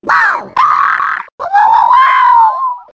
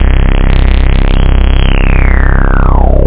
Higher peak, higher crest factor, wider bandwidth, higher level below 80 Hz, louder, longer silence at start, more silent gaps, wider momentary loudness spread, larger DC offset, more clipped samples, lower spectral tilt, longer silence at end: about the same, 0 dBFS vs 0 dBFS; about the same, 10 dB vs 6 dB; first, 8 kHz vs 4 kHz; second, -54 dBFS vs -6 dBFS; about the same, -9 LUFS vs -10 LUFS; about the same, 0.05 s vs 0 s; first, 1.32-1.38 s vs none; first, 9 LU vs 1 LU; neither; second, under 0.1% vs 0.1%; second, -2 dB/octave vs -10.5 dB/octave; about the same, 0.1 s vs 0 s